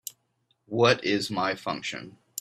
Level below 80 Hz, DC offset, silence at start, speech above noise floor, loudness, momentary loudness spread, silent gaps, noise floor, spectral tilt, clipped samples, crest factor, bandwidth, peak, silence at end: -68 dBFS; under 0.1%; 0.05 s; 46 dB; -26 LUFS; 17 LU; none; -72 dBFS; -4 dB/octave; under 0.1%; 24 dB; 14.5 kHz; -4 dBFS; 0 s